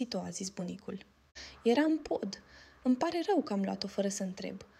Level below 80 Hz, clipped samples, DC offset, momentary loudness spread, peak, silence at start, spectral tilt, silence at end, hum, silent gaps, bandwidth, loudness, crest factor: -68 dBFS; under 0.1%; under 0.1%; 18 LU; -16 dBFS; 0 s; -5 dB/octave; 0.15 s; none; none; 13.5 kHz; -34 LUFS; 18 dB